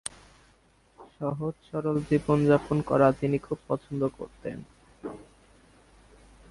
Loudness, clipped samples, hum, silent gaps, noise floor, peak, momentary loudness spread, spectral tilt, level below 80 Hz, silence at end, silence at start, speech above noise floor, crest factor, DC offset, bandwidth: -27 LUFS; under 0.1%; none; none; -62 dBFS; -8 dBFS; 19 LU; -7.5 dB/octave; -56 dBFS; 1.3 s; 1 s; 36 dB; 22 dB; under 0.1%; 11.5 kHz